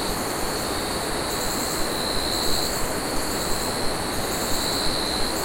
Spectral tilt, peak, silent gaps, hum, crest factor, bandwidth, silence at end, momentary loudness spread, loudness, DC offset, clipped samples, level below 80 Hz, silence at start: -2.5 dB/octave; -10 dBFS; none; none; 14 dB; 16.5 kHz; 0 s; 3 LU; -24 LUFS; under 0.1%; under 0.1%; -36 dBFS; 0 s